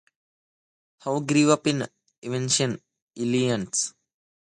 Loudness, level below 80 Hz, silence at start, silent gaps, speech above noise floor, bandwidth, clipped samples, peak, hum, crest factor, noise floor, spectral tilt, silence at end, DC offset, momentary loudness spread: -24 LUFS; -66 dBFS; 1.05 s; 2.18-2.22 s, 3.02-3.08 s; over 66 dB; 11.5 kHz; under 0.1%; -6 dBFS; none; 20 dB; under -90 dBFS; -4 dB/octave; 0.7 s; under 0.1%; 16 LU